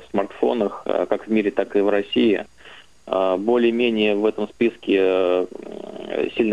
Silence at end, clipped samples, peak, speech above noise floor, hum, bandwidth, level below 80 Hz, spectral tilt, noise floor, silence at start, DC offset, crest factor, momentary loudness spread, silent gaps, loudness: 0 s; under 0.1%; -4 dBFS; 26 dB; none; 9.6 kHz; -62 dBFS; -6.5 dB/octave; -47 dBFS; 0 s; 0.3%; 18 dB; 8 LU; none; -21 LUFS